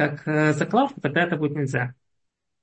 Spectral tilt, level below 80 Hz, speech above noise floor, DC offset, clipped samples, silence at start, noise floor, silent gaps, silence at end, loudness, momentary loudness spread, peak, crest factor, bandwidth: -6.5 dB/octave; -64 dBFS; 56 dB; under 0.1%; under 0.1%; 0 s; -79 dBFS; none; 0.7 s; -23 LUFS; 5 LU; -8 dBFS; 16 dB; 8.6 kHz